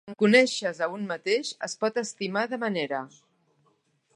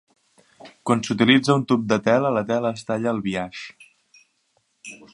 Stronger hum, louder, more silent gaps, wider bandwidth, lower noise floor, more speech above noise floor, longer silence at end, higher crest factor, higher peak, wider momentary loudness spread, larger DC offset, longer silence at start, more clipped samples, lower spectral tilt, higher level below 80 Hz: neither; second, -26 LUFS vs -21 LUFS; neither; about the same, 11 kHz vs 11 kHz; about the same, -69 dBFS vs -68 dBFS; second, 42 dB vs 47 dB; first, 1.1 s vs 0.2 s; about the same, 24 dB vs 22 dB; about the same, -4 dBFS vs -2 dBFS; second, 12 LU vs 21 LU; neither; second, 0.05 s vs 0.65 s; neither; second, -4 dB/octave vs -5.5 dB/octave; second, -80 dBFS vs -62 dBFS